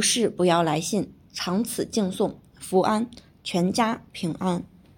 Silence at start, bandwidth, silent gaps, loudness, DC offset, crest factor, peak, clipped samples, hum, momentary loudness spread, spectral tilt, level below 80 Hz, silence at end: 0 s; 17.5 kHz; none; -25 LUFS; under 0.1%; 18 dB; -6 dBFS; under 0.1%; none; 10 LU; -4.5 dB/octave; -60 dBFS; 0.35 s